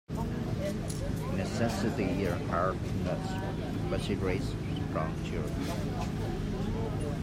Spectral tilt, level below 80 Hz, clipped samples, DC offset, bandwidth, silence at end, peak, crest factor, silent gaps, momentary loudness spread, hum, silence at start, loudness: -6.5 dB/octave; -42 dBFS; under 0.1%; under 0.1%; 16 kHz; 0 s; -16 dBFS; 16 dB; none; 4 LU; none; 0.1 s; -33 LUFS